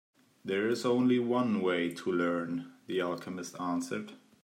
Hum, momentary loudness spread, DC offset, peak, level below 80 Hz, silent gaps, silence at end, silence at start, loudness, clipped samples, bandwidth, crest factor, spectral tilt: none; 12 LU; under 0.1%; -18 dBFS; -82 dBFS; none; 0.25 s; 0.45 s; -32 LUFS; under 0.1%; 15.5 kHz; 14 dB; -5.5 dB/octave